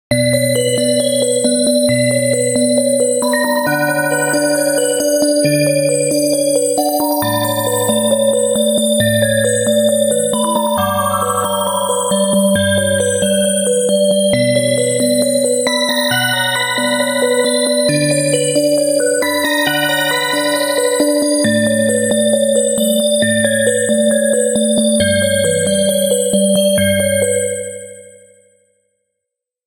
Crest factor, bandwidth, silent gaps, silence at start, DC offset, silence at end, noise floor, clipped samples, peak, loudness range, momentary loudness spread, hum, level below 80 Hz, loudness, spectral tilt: 12 dB; 16 kHz; none; 0.1 s; under 0.1%; 1.6 s; -80 dBFS; under 0.1%; -2 dBFS; 1 LU; 2 LU; none; -52 dBFS; -13 LUFS; -3.5 dB/octave